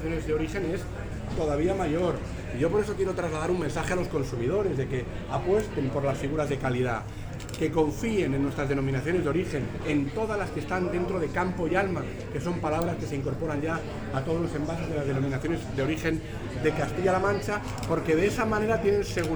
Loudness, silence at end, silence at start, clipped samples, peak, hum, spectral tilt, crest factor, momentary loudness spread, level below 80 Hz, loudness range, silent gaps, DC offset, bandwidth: -28 LUFS; 0 s; 0 s; under 0.1%; -10 dBFS; none; -6.5 dB/octave; 18 dB; 6 LU; -42 dBFS; 2 LU; none; under 0.1%; over 20 kHz